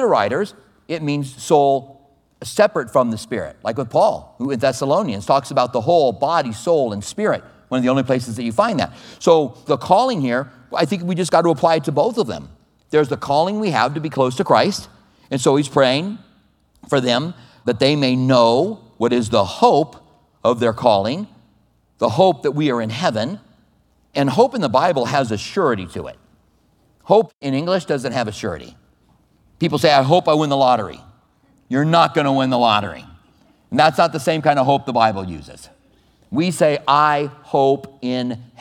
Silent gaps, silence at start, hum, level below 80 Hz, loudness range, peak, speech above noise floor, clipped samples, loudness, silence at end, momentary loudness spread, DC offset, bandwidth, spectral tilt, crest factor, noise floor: 27.34-27.39 s; 0 s; none; -56 dBFS; 3 LU; 0 dBFS; 41 dB; under 0.1%; -18 LUFS; 0.15 s; 11 LU; under 0.1%; 15.5 kHz; -5.5 dB/octave; 18 dB; -59 dBFS